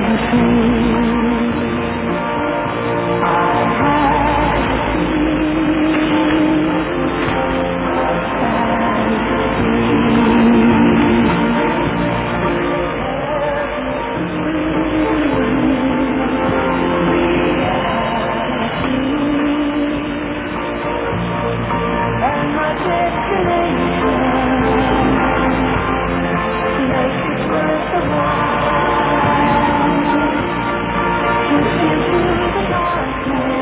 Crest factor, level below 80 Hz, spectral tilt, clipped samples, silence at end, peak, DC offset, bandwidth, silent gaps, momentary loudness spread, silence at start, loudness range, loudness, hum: 14 dB; -32 dBFS; -10.5 dB/octave; under 0.1%; 0 s; -2 dBFS; under 0.1%; 4 kHz; none; 5 LU; 0 s; 4 LU; -16 LUFS; none